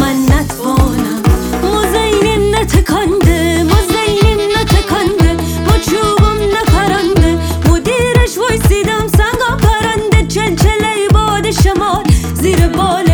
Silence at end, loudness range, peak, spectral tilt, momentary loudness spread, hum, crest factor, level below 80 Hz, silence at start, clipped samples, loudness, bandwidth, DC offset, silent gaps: 0 s; 1 LU; 0 dBFS; -5.5 dB/octave; 2 LU; none; 10 dB; -16 dBFS; 0 s; under 0.1%; -11 LUFS; over 20 kHz; under 0.1%; none